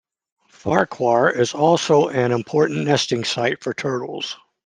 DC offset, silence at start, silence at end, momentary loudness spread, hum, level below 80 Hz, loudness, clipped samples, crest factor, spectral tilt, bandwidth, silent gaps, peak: under 0.1%; 0.65 s; 0.3 s; 9 LU; none; -62 dBFS; -19 LUFS; under 0.1%; 18 dB; -5 dB/octave; 10 kHz; none; -2 dBFS